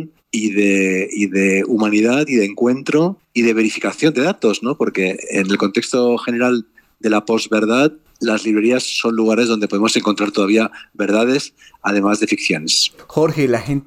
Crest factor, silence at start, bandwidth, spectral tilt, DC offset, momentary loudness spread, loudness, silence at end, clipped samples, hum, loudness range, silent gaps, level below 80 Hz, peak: 14 dB; 0 s; 15 kHz; -4.5 dB/octave; under 0.1%; 5 LU; -17 LUFS; 0.05 s; under 0.1%; none; 1 LU; none; -58 dBFS; -2 dBFS